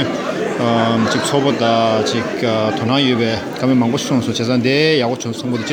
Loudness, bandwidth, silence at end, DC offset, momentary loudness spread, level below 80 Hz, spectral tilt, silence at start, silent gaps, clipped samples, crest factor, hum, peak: -16 LUFS; 17.5 kHz; 0 s; under 0.1%; 6 LU; -54 dBFS; -5 dB/octave; 0 s; none; under 0.1%; 14 dB; none; -2 dBFS